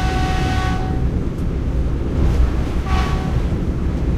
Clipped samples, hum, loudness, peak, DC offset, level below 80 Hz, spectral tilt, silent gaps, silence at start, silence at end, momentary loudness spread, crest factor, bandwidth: under 0.1%; none; -20 LUFS; -4 dBFS; under 0.1%; -20 dBFS; -7 dB/octave; none; 0 s; 0 s; 3 LU; 14 dB; 11.5 kHz